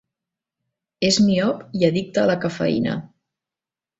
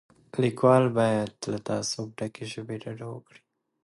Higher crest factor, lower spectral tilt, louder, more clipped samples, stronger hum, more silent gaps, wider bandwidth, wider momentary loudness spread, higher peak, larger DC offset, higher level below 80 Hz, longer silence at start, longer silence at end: about the same, 18 dB vs 20 dB; about the same, -5 dB/octave vs -5.5 dB/octave; first, -20 LUFS vs -27 LUFS; neither; neither; neither; second, 8.2 kHz vs 11.5 kHz; second, 7 LU vs 17 LU; first, -4 dBFS vs -8 dBFS; neither; first, -58 dBFS vs -66 dBFS; first, 1 s vs 0.35 s; first, 0.95 s vs 0.65 s